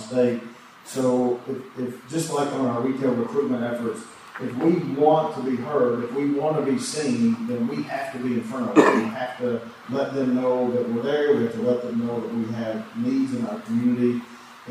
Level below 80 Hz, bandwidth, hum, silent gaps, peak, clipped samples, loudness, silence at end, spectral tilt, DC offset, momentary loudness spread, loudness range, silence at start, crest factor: -70 dBFS; 14.5 kHz; none; none; -2 dBFS; under 0.1%; -24 LUFS; 0 s; -6 dB/octave; under 0.1%; 11 LU; 3 LU; 0 s; 22 dB